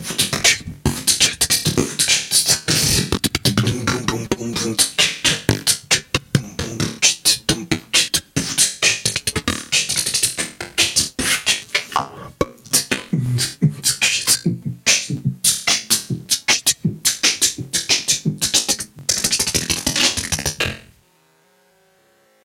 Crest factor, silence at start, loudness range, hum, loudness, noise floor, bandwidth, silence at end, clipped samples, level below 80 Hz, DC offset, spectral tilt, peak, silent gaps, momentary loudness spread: 20 dB; 0 s; 3 LU; none; -17 LUFS; -57 dBFS; 17 kHz; 1.65 s; under 0.1%; -44 dBFS; under 0.1%; -2 dB/octave; 0 dBFS; none; 8 LU